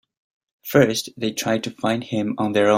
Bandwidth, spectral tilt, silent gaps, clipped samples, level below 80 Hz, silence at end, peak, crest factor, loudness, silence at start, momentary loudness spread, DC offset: 16 kHz; -5 dB/octave; none; under 0.1%; -60 dBFS; 0 s; -2 dBFS; 20 dB; -22 LUFS; 0.65 s; 8 LU; under 0.1%